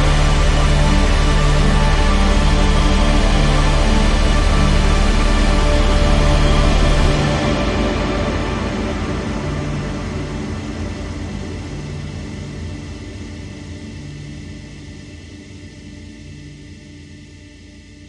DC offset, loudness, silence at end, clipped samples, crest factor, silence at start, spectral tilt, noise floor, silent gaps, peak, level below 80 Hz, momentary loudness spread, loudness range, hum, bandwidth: under 0.1%; -18 LUFS; 0 s; under 0.1%; 16 dB; 0 s; -5.5 dB/octave; -40 dBFS; none; -2 dBFS; -18 dBFS; 20 LU; 18 LU; none; 11 kHz